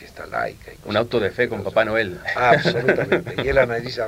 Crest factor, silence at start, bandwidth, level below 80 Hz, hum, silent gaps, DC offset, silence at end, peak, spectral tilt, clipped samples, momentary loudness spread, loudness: 20 dB; 0 s; 16 kHz; -44 dBFS; none; none; under 0.1%; 0 s; -2 dBFS; -6 dB/octave; under 0.1%; 10 LU; -20 LUFS